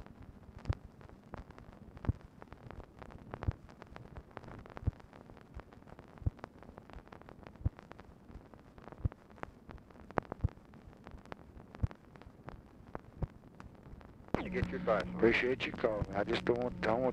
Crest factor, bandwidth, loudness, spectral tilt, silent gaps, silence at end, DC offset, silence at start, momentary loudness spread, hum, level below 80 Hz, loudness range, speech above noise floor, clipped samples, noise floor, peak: 30 dB; 10 kHz; -37 LUFS; -7.5 dB/octave; none; 0 s; under 0.1%; 0 s; 21 LU; none; -50 dBFS; 12 LU; 23 dB; under 0.1%; -56 dBFS; -10 dBFS